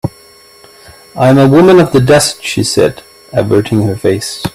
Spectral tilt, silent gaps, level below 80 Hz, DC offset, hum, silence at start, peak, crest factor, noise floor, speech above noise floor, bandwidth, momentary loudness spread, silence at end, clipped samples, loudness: -5.5 dB/octave; none; -40 dBFS; under 0.1%; none; 0.05 s; 0 dBFS; 10 dB; -40 dBFS; 31 dB; 15.5 kHz; 11 LU; 0.05 s; under 0.1%; -9 LUFS